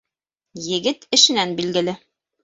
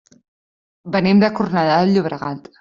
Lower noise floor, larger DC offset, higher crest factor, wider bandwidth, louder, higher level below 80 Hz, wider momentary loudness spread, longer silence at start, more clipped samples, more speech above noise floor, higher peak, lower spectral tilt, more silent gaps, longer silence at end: second, -85 dBFS vs under -90 dBFS; neither; about the same, 20 dB vs 16 dB; first, 8.4 kHz vs 7.2 kHz; about the same, -18 LUFS vs -17 LUFS; second, -66 dBFS vs -56 dBFS; first, 16 LU vs 11 LU; second, 0.55 s vs 0.85 s; neither; second, 65 dB vs over 73 dB; about the same, -2 dBFS vs -2 dBFS; second, -2 dB/octave vs -5.5 dB/octave; neither; first, 0.5 s vs 0.2 s